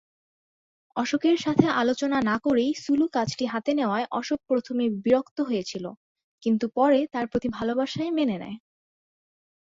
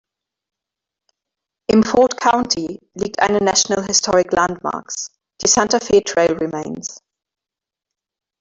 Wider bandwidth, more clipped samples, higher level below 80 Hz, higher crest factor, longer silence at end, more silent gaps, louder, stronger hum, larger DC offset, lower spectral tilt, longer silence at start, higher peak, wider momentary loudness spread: about the same, 7.8 kHz vs 8 kHz; neither; second, -62 dBFS vs -50 dBFS; about the same, 22 dB vs 18 dB; second, 1.15 s vs 1.45 s; first, 5.31-5.36 s, 5.97-6.15 s, 6.24-6.38 s vs none; second, -25 LUFS vs -17 LUFS; neither; neither; first, -5.5 dB/octave vs -2.5 dB/octave; second, 0.95 s vs 1.7 s; second, -4 dBFS vs 0 dBFS; second, 9 LU vs 13 LU